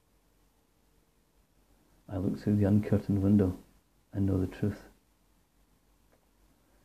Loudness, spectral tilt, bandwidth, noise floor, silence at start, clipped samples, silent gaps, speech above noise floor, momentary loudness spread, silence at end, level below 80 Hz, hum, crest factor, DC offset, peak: -30 LUFS; -9.5 dB/octave; 14 kHz; -69 dBFS; 2.1 s; under 0.1%; none; 41 dB; 15 LU; 2.05 s; -62 dBFS; none; 20 dB; under 0.1%; -14 dBFS